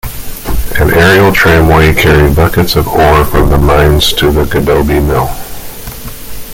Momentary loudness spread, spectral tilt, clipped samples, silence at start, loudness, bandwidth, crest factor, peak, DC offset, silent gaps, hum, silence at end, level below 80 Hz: 18 LU; -5.5 dB/octave; under 0.1%; 0.05 s; -8 LUFS; 17.5 kHz; 8 dB; 0 dBFS; under 0.1%; none; none; 0 s; -16 dBFS